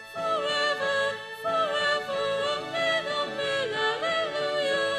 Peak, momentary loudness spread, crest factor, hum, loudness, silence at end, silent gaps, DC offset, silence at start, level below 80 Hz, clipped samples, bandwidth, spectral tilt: -14 dBFS; 4 LU; 14 dB; none; -27 LUFS; 0 s; none; under 0.1%; 0 s; -68 dBFS; under 0.1%; 13.5 kHz; -2.5 dB/octave